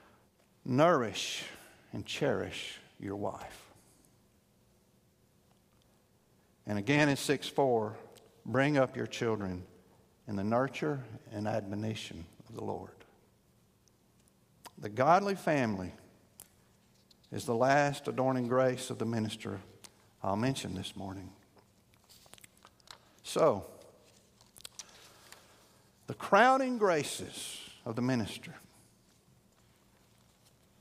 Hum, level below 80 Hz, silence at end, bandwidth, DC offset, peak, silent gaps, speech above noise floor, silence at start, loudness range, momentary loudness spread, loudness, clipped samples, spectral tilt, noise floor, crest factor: none; -70 dBFS; 2.2 s; 15.5 kHz; under 0.1%; -10 dBFS; none; 36 dB; 0.65 s; 9 LU; 23 LU; -32 LUFS; under 0.1%; -5 dB/octave; -68 dBFS; 24 dB